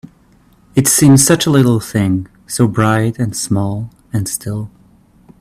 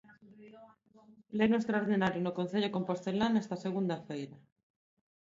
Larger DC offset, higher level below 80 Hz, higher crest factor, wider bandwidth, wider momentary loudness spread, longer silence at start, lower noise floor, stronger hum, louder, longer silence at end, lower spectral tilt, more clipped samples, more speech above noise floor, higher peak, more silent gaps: neither; first, -46 dBFS vs -70 dBFS; about the same, 14 dB vs 18 dB; first, 16 kHz vs 7.6 kHz; first, 15 LU vs 11 LU; second, 0.05 s vs 0.25 s; second, -49 dBFS vs -61 dBFS; neither; first, -14 LUFS vs -33 LUFS; about the same, 0.75 s vs 0.85 s; second, -5 dB/octave vs -7 dB/octave; neither; first, 37 dB vs 29 dB; first, 0 dBFS vs -16 dBFS; neither